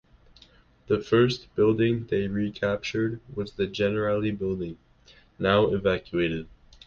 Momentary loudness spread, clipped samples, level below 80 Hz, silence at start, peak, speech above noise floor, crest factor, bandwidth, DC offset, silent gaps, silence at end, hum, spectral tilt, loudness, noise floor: 10 LU; under 0.1%; -50 dBFS; 0.9 s; -8 dBFS; 31 dB; 18 dB; 7.2 kHz; under 0.1%; none; 0.4 s; none; -7 dB/octave; -26 LUFS; -57 dBFS